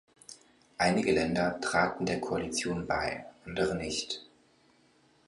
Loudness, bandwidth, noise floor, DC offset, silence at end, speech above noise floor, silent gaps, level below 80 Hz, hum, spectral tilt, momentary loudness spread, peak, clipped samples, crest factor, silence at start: -31 LUFS; 11.5 kHz; -65 dBFS; under 0.1%; 1.05 s; 35 dB; none; -56 dBFS; none; -4.5 dB/octave; 14 LU; -10 dBFS; under 0.1%; 22 dB; 0.3 s